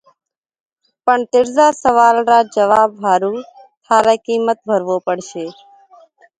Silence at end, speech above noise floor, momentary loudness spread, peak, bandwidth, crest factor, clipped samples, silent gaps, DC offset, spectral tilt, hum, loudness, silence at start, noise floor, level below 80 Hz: 0.9 s; 33 dB; 11 LU; 0 dBFS; 9.4 kHz; 16 dB; under 0.1%; 3.77-3.81 s; under 0.1%; -4 dB/octave; none; -14 LUFS; 1.05 s; -47 dBFS; -58 dBFS